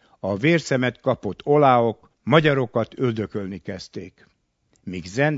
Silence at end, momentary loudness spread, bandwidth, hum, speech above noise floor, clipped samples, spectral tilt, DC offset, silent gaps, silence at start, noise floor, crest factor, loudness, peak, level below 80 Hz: 0 s; 17 LU; 8 kHz; none; 45 dB; under 0.1%; -6.5 dB/octave; under 0.1%; none; 0.25 s; -66 dBFS; 22 dB; -21 LUFS; 0 dBFS; -60 dBFS